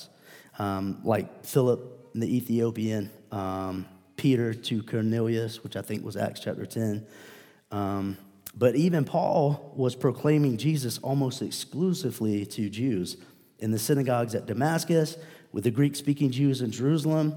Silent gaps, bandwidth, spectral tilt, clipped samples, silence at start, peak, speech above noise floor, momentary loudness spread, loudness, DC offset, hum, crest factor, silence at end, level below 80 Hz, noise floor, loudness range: none; 19 kHz; -6.5 dB/octave; under 0.1%; 0 s; -8 dBFS; 26 dB; 11 LU; -28 LUFS; under 0.1%; none; 18 dB; 0 s; -74 dBFS; -53 dBFS; 4 LU